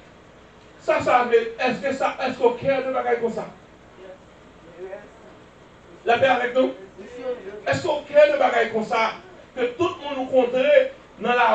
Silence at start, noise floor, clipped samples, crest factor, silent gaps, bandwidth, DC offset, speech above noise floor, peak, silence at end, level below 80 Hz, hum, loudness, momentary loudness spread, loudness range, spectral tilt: 0.85 s; -48 dBFS; under 0.1%; 20 dB; none; 8.4 kHz; under 0.1%; 27 dB; -4 dBFS; 0 s; -58 dBFS; none; -21 LUFS; 20 LU; 7 LU; -5 dB/octave